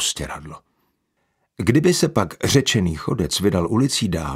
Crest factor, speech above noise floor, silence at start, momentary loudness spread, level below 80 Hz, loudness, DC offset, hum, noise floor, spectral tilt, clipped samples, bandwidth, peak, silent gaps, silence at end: 20 dB; 51 dB; 0 s; 11 LU; -42 dBFS; -19 LUFS; under 0.1%; none; -71 dBFS; -4.5 dB/octave; under 0.1%; 16 kHz; 0 dBFS; none; 0 s